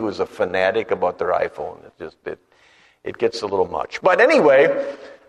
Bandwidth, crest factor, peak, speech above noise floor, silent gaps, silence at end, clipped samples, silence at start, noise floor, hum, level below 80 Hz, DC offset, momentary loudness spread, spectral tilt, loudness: 10.5 kHz; 18 dB; -2 dBFS; 35 dB; none; 0.15 s; under 0.1%; 0 s; -54 dBFS; none; -60 dBFS; under 0.1%; 21 LU; -5 dB/octave; -18 LUFS